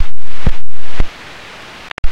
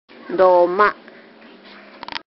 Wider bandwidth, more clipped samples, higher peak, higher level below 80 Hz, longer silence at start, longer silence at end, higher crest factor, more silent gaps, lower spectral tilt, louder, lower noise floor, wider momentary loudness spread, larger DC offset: first, 6.6 kHz vs 5.8 kHz; first, 0.2% vs under 0.1%; about the same, 0 dBFS vs -2 dBFS; first, -20 dBFS vs -62 dBFS; second, 0 s vs 0.25 s; about the same, 0 s vs 0.1 s; second, 8 dB vs 18 dB; first, 1.92-2.03 s vs none; second, -5.5 dB/octave vs -7.5 dB/octave; second, -27 LUFS vs -16 LUFS; second, -33 dBFS vs -44 dBFS; second, 9 LU vs 22 LU; neither